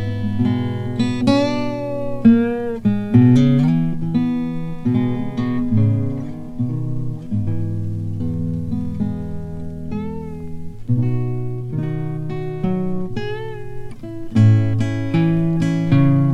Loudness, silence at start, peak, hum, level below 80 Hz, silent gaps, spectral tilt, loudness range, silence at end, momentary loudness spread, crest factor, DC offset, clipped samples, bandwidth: -19 LUFS; 0 s; -2 dBFS; none; -40 dBFS; none; -9 dB/octave; 8 LU; 0 s; 15 LU; 16 dB; under 0.1%; under 0.1%; 9.4 kHz